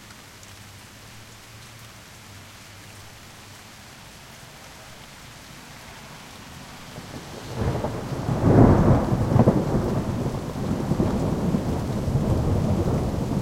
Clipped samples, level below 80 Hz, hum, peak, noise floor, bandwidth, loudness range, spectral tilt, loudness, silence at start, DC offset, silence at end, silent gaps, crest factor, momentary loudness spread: under 0.1%; -38 dBFS; none; -2 dBFS; -44 dBFS; 16.5 kHz; 22 LU; -7.5 dB/octave; -23 LUFS; 0 s; under 0.1%; 0 s; none; 24 dB; 24 LU